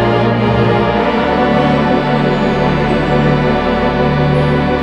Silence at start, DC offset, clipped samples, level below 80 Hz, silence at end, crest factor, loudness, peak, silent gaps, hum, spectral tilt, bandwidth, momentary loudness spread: 0 s; under 0.1%; under 0.1%; -28 dBFS; 0 s; 12 dB; -13 LUFS; 0 dBFS; none; none; -8 dB/octave; 8.4 kHz; 1 LU